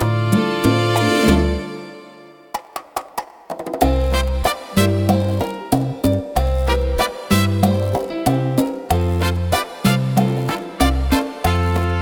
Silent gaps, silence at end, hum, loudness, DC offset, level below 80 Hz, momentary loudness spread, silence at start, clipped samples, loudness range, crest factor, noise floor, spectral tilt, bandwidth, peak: none; 0 s; none; -19 LUFS; under 0.1%; -26 dBFS; 13 LU; 0 s; under 0.1%; 3 LU; 18 dB; -42 dBFS; -6 dB/octave; 18 kHz; 0 dBFS